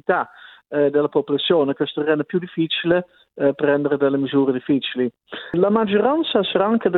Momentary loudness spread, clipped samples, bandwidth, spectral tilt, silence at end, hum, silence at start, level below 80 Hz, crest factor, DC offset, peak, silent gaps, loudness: 7 LU; under 0.1%; 4.3 kHz; -9.5 dB/octave; 0 s; none; 0.1 s; -62 dBFS; 16 dB; under 0.1%; -4 dBFS; none; -20 LUFS